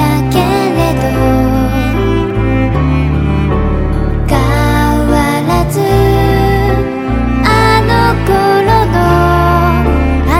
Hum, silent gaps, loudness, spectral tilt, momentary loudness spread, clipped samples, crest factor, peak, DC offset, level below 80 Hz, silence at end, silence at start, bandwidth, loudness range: none; none; -11 LUFS; -7 dB/octave; 4 LU; 0.3%; 10 dB; 0 dBFS; under 0.1%; -16 dBFS; 0 s; 0 s; 16.5 kHz; 3 LU